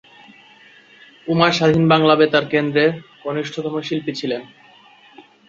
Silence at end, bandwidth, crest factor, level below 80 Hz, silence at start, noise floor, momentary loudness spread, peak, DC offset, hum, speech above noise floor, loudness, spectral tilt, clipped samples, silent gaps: 0.3 s; 7.6 kHz; 18 dB; -58 dBFS; 1.25 s; -48 dBFS; 13 LU; -2 dBFS; under 0.1%; none; 31 dB; -18 LUFS; -6 dB/octave; under 0.1%; none